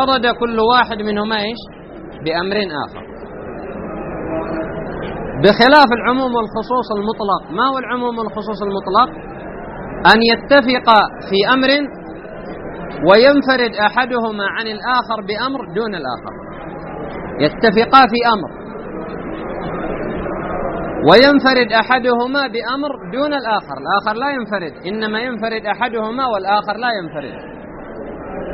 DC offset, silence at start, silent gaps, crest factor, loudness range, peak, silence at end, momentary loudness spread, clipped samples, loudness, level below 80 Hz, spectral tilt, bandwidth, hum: under 0.1%; 0 s; none; 16 dB; 7 LU; 0 dBFS; 0 s; 20 LU; under 0.1%; -15 LUFS; -40 dBFS; -2 dB/octave; 6 kHz; none